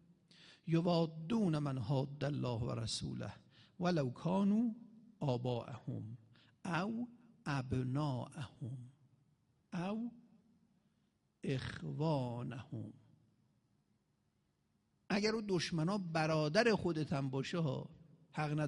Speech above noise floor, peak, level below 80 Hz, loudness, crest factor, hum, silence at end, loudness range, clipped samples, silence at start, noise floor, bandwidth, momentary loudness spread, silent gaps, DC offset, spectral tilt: 42 dB; -20 dBFS; -68 dBFS; -39 LUFS; 20 dB; none; 0 s; 8 LU; under 0.1%; 0.4 s; -80 dBFS; 11.5 kHz; 15 LU; none; under 0.1%; -6.5 dB/octave